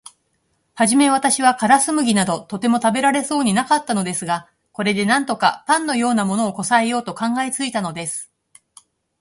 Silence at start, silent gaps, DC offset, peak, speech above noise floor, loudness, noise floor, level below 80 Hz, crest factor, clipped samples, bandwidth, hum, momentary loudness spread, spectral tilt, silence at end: 0.75 s; none; under 0.1%; 0 dBFS; 49 dB; -18 LUFS; -67 dBFS; -62 dBFS; 18 dB; under 0.1%; 11.5 kHz; none; 9 LU; -3.5 dB/octave; 0.95 s